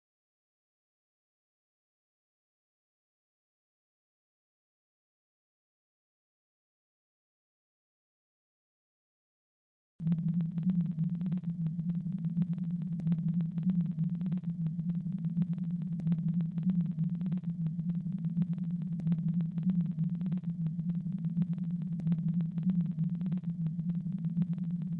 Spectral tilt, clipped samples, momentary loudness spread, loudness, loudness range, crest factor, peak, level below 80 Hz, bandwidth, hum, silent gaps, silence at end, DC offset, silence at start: -12 dB/octave; under 0.1%; 4 LU; -34 LUFS; 2 LU; 14 dB; -22 dBFS; -66 dBFS; 3.6 kHz; none; none; 0 s; under 0.1%; 10 s